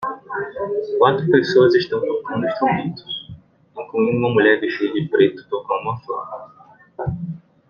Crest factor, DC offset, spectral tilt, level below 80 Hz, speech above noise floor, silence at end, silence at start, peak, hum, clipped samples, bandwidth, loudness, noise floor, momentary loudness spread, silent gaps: 18 dB; under 0.1%; -7.5 dB/octave; -54 dBFS; 23 dB; 0.3 s; 0 s; -2 dBFS; none; under 0.1%; 7 kHz; -19 LUFS; -42 dBFS; 15 LU; none